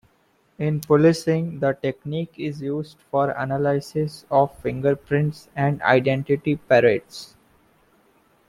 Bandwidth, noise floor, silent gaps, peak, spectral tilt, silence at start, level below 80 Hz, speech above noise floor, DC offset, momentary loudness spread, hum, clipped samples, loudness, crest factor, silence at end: 15.5 kHz; -63 dBFS; none; -4 dBFS; -7 dB/octave; 0.6 s; -56 dBFS; 41 dB; under 0.1%; 12 LU; none; under 0.1%; -22 LUFS; 20 dB; 1.25 s